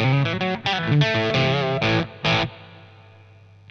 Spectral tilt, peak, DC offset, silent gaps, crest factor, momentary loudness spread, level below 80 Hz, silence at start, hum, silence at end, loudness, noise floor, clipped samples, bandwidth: -6 dB/octave; -6 dBFS; under 0.1%; none; 16 dB; 4 LU; -50 dBFS; 0 s; none; 0.85 s; -21 LUFS; -48 dBFS; under 0.1%; 7.2 kHz